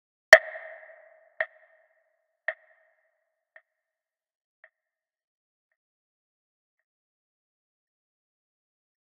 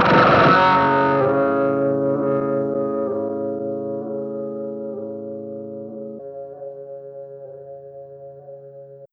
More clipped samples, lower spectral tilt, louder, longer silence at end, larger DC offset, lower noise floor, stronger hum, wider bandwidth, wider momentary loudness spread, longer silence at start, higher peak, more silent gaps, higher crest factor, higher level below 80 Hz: neither; second, 3.5 dB/octave vs -7.5 dB/octave; about the same, -21 LUFS vs -19 LUFS; first, 6.55 s vs 0.05 s; neither; first, under -90 dBFS vs -41 dBFS; neither; second, 4.9 kHz vs 6.8 kHz; about the same, 25 LU vs 25 LU; first, 0.3 s vs 0 s; about the same, 0 dBFS vs -2 dBFS; neither; first, 32 dB vs 18 dB; second, -74 dBFS vs -54 dBFS